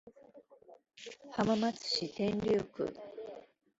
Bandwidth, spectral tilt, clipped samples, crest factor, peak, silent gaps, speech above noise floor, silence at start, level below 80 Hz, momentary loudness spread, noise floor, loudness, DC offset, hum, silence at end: 8 kHz; -4 dB/octave; under 0.1%; 20 dB; -18 dBFS; none; 25 dB; 0.05 s; -68 dBFS; 18 LU; -59 dBFS; -34 LUFS; under 0.1%; none; 0.35 s